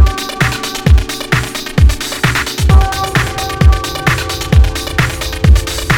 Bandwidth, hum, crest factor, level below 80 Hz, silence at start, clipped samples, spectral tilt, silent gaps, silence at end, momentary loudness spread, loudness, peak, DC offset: 18 kHz; none; 12 dB; -14 dBFS; 0 s; 0.4%; -4.5 dB/octave; none; 0 s; 4 LU; -13 LUFS; 0 dBFS; under 0.1%